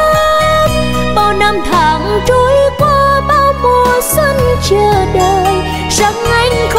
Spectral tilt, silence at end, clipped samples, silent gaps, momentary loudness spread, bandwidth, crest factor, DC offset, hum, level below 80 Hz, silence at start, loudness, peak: -4.5 dB/octave; 0 s; under 0.1%; none; 3 LU; 16.5 kHz; 10 dB; under 0.1%; none; -24 dBFS; 0 s; -10 LUFS; 0 dBFS